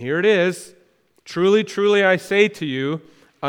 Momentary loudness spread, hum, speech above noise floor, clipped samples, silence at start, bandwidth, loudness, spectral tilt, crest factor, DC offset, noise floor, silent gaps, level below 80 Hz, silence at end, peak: 12 LU; none; 39 dB; under 0.1%; 0 s; 14 kHz; -18 LUFS; -5 dB/octave; 18 dB; under 0.1%; -57 dBFS; none; -70 dBFS; 0 s; -2 dBFS